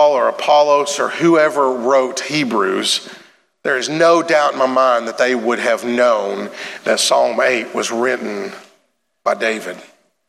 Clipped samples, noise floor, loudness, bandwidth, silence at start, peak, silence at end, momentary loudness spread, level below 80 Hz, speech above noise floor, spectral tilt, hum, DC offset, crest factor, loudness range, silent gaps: under 0.1%; -62 dBFS; -16 LUFS; 14.5 kHz; 0 s; -2 dBFS; 0.45 s; 12 LU; -76 dBFS; 47 dB; -3 dB/octave; none; under 0.1%; 14 dB; 3 LU; none